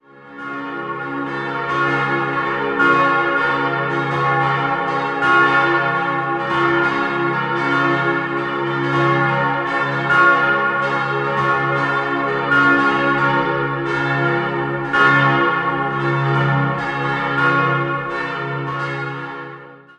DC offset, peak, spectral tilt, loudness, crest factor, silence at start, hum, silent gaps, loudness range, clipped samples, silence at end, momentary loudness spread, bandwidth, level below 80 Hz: under 0.1%; -2 dBFS; -6.5 dB/octave; -17 LUFS; 16 dB; 0.15 s; none; none; 3 LU; under 0.1%; 0.15 s; 10 LU; 9 kHz; -52 dBFS